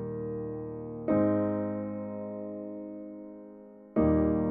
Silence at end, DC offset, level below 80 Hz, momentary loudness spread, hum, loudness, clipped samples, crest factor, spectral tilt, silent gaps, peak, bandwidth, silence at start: 0 s; under 0.1%; -48 dBFS; 19 LU; none; -31 LUFS; under 0.1%; 18 dB; -11 dB/octave; none; -12 dBFS; 3.1 kHz; 0 s